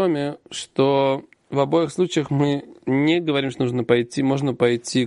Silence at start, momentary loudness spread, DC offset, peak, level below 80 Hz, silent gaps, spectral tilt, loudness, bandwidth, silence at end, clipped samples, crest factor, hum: 0 s; 8 LU; under 0.1%; -2 dBFS; -62 dBFS; none; -6 dB/octave; -21 LUFS; 11.5 kHz; 0 s; under 0.1%; 18 dB; none